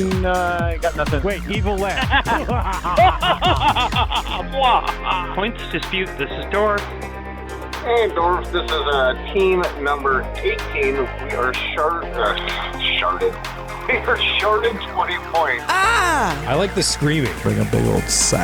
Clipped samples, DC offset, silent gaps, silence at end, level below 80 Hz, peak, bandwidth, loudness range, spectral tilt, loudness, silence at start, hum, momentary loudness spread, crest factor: under 0.1%; under 0.1%; none; 0 s; -30 dBFS; -4 dBFS; over 20 kHz; 3 LU; -4 dB/octave; -19 LUFS; 0 s; none; 7 LU; 14 dB